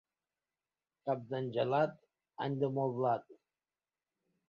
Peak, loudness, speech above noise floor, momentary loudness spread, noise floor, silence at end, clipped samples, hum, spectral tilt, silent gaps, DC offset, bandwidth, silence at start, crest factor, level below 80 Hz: -18 dBFS; -36 LUFS; over 56 dB; 7 LU; under -90 dBFS; 1.15 s; under 0.1%; none; -6 dB/octave; none; under 0.1%; 7 kHz; 1.05 s; 20 dB; -82 dBFS